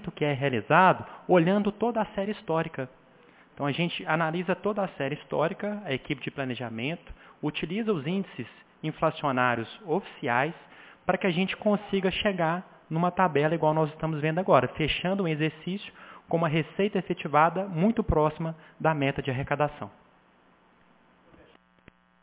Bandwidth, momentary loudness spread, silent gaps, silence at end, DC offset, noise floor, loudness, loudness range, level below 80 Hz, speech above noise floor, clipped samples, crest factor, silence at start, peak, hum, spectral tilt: 4 kHz; 11 LU; none; 2.35 s; under 0.1%; -61 dBFS; -27 LUFS; 6 LU; -52 dBFS; 34 dB; under 0.1%; 22 dB; 0 s; -6 dBFS; none; -10 dB/octave